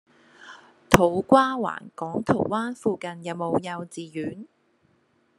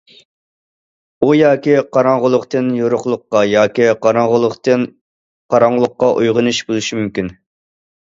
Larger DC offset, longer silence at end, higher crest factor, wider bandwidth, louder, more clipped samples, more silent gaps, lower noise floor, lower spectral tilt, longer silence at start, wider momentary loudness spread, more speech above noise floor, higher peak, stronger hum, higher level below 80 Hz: neither; first, 0.95 s vs 0.7 s; first, 26 dB vs 14 dB; first, 12.5 kHz vs 7.8 kHz; second, -25 LUFS vs -14 LUFS; neither; second, none vs 5.01-5.49 s; second, -66 dBFS vs under -90 dBFS; about the same, -5.5 dB/octave vs -5.5 dB/octave; second, 0.4 s vs 1.2 s; first, 15 LU vs 7 LU; second, 41 dB vs over 77 dB; about the same, 0 dBFS vs 0 dBFS; neither; about the same, -50 dBFS vs -54 dBFS